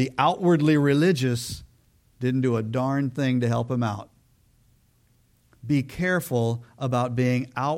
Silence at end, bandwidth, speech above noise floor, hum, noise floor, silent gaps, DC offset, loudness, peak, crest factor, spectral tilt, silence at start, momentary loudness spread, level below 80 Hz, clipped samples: 0 s; 16.5 kHz; 39 dB; none; -62 dBFS; none; under 0.1%; -24 LUFS; -6 dBFS; 18 dB; -6.5 dB/octave; 0 s; 10 LU; -56 dBFS; under 0.1%